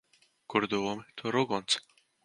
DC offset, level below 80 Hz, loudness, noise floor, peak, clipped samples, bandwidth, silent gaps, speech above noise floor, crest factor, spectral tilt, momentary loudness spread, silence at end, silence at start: under 0.1%; -72 dBFS; -31 LUFS; -53 dBFS; -12 dBFS; under 0.1%; 11.5 kHz; none; 22 dB; 22 dB; -3.5 dB/octave; 5 LU; 0.45 s; 0.5 s